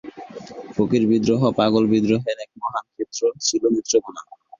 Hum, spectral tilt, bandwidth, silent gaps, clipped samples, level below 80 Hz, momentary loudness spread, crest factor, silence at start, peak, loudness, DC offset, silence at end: none; -5 dB/octave; 7.4 kHz; none; under 0.1%; -56 dBFS; 19 LU; 16 dB; 0.05 s; -4 dBFS; -21 LUFS; under 0.1%; 0.4 s